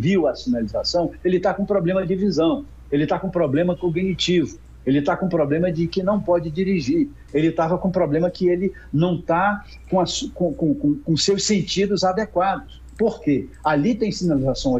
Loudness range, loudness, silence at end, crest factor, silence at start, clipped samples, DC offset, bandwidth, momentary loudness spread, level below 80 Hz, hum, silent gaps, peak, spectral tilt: 1 LU; -21 LUFS; 0 s; 14 dB; 0 s; under 0.1%; under 0.1%; 8.6 kHz; 4 LU; -42 dBFS; none; none; -6 dBFS; -5.5 dB/octave